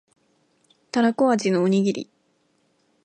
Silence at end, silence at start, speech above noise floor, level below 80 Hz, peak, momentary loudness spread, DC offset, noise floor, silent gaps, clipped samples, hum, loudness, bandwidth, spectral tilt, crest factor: 1 s; 0.95 s; 46 dB; -74 dBFS; -8 dBFS; 11 LU; under 0.1%; -67 dBFS; none; under 0.1%; none; -22 LUFS; 9.4 kHz; -6 dB/octave; 16 dB